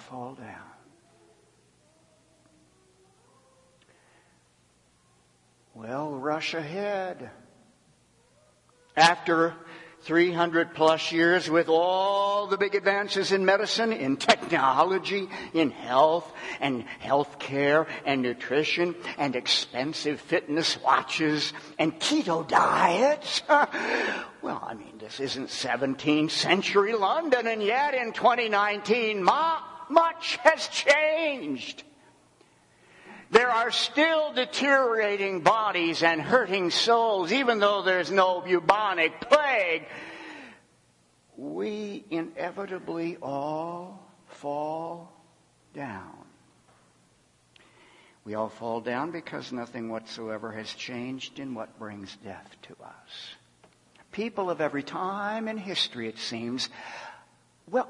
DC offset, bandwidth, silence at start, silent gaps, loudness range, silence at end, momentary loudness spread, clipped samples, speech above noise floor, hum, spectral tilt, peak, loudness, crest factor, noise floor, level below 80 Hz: under 0.1%; 11.5 kHz; 0 s; none; 14 LU; 0 s; 17 LU; under 0.1%; 38 dB; none; -3.5 dB/octave; -2 dBFS; -26 LUFS; 24 dB; -64 dBFS; -72 dBFS